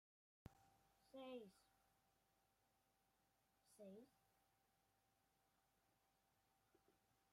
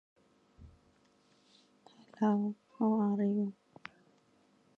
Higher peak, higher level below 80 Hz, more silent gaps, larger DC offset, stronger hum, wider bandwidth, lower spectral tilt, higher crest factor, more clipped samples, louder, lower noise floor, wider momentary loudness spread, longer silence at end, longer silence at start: second, -44 dBFS vs -18 dBFS; second, -88 dBFS vs -72 dBFS; neither; neither; neither; first, 15 kHz vs 6 kHz; second, -5.5 dB/octave vs -9.5 dB/octave; first, 24 dB vs 18 dB; neither; second, -63 LUFS vs -33 LUFS; first, -85 dBFS vs -69 dBFS; second, 11 LU vs 22 LU; second, 0.05 s vs 1.25 s; second, 0.45 s vs 0.6 s